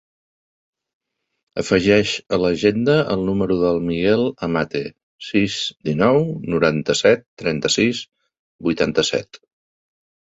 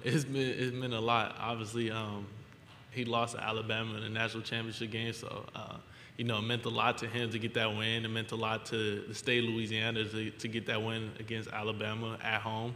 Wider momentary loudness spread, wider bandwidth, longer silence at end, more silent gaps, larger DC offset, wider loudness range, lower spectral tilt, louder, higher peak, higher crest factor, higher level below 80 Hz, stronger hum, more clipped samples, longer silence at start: about the same, 10 LU vs 11 LU; second, 8 kHz vs 15.5 kHz; first, 0.9 s vs 0 s; first, 5.03-5.19 s, 7.28-7.37 s, 8.39-8.59 s vs none; neither; about the same, 2 LU vs 3 LU; about the same, -5 dB/octave vs -5 dB/octave; first, -19 LUFS vs -35 LUFS; first, -2 dBFS vs -12 dBFS; about the same, 18 dB vs 22 dB; first, -48 dBFS vs -68 dBFS; neither; neither; first, 1.55 s vs 0 s